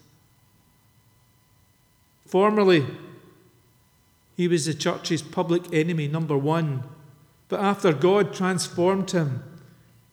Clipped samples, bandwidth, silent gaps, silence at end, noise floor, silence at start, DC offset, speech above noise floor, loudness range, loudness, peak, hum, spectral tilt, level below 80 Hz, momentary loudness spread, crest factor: under 0.1%; 16 kHz; none; 0.55 s; -62 dBFS; 2.3 s; under 0.1%; 39 dB; 2 LU; -23 LUFS; -8 dBFS; none; -6 dB/octave; -70 dBFS; 13 LU; 18 dB